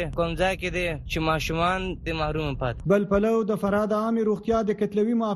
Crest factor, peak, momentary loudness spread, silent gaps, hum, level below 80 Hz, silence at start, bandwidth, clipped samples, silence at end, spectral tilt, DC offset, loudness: 16 dB; -8 dBFS; 6 LU; none; none; -40 dBFS; 0 s; 13 kHz; under 0.1%; 0 s; -6.5 dB/octave; under 0.1%; -25 LUFS